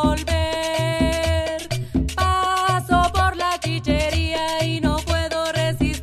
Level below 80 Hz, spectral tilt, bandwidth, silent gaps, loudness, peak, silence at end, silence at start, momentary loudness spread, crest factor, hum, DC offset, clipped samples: -28 dBFS; -5 dB/octave; 15.5 kHz; none; -21 LUFS; -6 dBFS; 0 s; 0 s; 5 LU; 16 dB; none; under 0.1%; under 0.1%